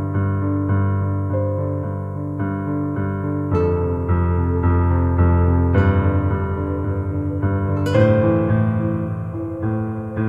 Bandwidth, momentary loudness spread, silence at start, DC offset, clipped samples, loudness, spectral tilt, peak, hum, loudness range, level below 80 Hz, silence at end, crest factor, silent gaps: 5.2 kHz; 8 LU; 0 s; under 0.1%; under 0.1%; -20 LUFS; -10 dB/octave; -2 dBFS; none; 4 LU; -32 dBFS; 0 s; 16 dB; none